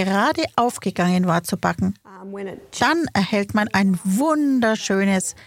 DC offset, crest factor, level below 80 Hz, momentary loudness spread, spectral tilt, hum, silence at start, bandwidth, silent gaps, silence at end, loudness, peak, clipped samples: under 0.1%; 18 dB; -54 dBFS; 13 LU; -5 dB/octave; none; 0 s; 16 kHz; none; 0.15 s; -20 LUFS; -2 dBFS; under 0.1%